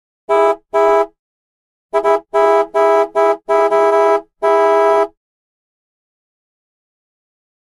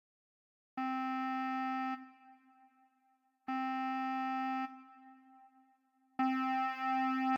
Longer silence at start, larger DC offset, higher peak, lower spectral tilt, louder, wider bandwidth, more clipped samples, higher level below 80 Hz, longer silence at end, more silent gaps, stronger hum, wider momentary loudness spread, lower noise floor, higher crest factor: second, 0.3 s vs 0.75 s; neither; first, -2 dBFS vs -22 dBFS; about the same, -3.5 dB/octave vs -4 dB/octave; first, -14 LUFS vs -37 LUFS; first, 11.5 kHz vs 7 kHz; neither; first, -56 dBFS vs under -90 dBFS; first, 2.6 s vs 0 s; first, 1.19-1.89 s vs none; neither; second, 5 LU vs 15 LU; first, under -90 dBFS vs -76 dBFS; about the same, 14 dB vs 16 dB